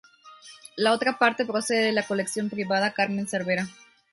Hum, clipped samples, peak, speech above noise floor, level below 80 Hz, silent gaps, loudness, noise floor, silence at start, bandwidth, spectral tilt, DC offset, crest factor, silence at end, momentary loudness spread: none; under 0.1%; -6 dBFS; 24 dB; -70 dBFS; none; -25 LUFS; -49 dBFS; 0.25 s; 12 kHz; -4 dB/octave; under 0.1%; 20 dB; 0.4 s; 7 LU